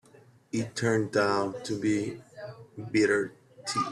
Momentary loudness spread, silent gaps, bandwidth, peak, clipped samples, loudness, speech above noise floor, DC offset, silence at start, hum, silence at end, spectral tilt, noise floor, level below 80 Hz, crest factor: 18 LU; none; 12.5 kHz; -12 dBFS; under 0.1%; -29 LUFS; 30 dB; under 0.1%; 0.55 s; none; 0 s; -5 dB/octave; -57 dBFS; -68 dBFS; 18 dB